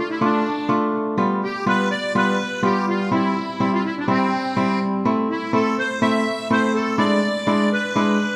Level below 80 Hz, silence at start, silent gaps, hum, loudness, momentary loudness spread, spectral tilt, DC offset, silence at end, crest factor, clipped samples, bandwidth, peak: -64 dBFS; 0 s; none; none; -20 LUFS; 3 LU; -6 dB/octave; under 0.1%; 0 s; 14 dB; under 0.1%; 11 kHz; -6 dBFS